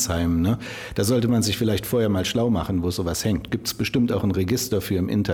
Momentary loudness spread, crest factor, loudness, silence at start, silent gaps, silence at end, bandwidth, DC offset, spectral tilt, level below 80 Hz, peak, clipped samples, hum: 4 LU; 14 dB; -23 LUFS; 0 s; none; 0 s; over 20 kHz; under 0.1%; -5 dB/octave; -42 dBFS; -10 dBFS; under 0.1%; none